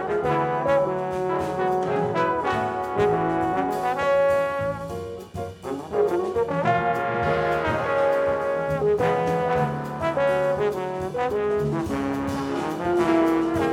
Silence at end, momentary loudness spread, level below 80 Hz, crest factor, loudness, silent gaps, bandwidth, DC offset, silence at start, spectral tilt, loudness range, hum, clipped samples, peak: 0 s; 6 LU; -50 dBFS; 16 dB; -24 LUFS; none; 16 kHz; under 0.1%; 0 s; -7 dB/octave; 2 LU; none; under 0.1%; -8 dBFS